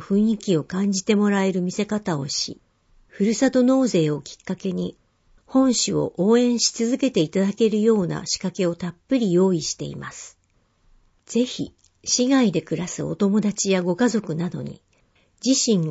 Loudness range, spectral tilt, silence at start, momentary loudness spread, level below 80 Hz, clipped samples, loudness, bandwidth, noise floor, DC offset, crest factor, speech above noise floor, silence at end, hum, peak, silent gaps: 4 LU; -4.5 dB/octave; 0 s; 12 LU; -58 dBFS; under 0.1%; -22 LUFS; 8 kHz; -63 dBFS; under 0.1%; 16 dB; 42 dB; 0 s; none; -6 dBFS; none